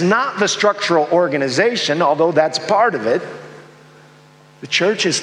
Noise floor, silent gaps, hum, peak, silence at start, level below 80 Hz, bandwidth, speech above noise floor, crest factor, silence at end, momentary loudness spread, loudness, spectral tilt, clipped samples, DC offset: -46 dBFS; none; none; -2 dBFS; 0 s; -70 dBFS; 11.5 kHz; 30 dB; 16 dB; 0 s; 5 LU; -16 LUFS; -3.5 dB/octave; under 0.1%; under 0.1%